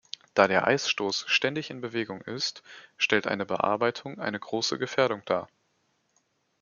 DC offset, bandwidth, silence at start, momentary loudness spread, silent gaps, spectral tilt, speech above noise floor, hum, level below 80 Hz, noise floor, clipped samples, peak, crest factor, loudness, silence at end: under 0.1%; 7.4 kHz; 0.35 s; 10 LU; none; -3.5 dB/octave; 45 dB; none; -72 dBFS; -72 dBFS; under 0.1%; -4 dBFS; 26 dB; -27 LUFS; 1.15 s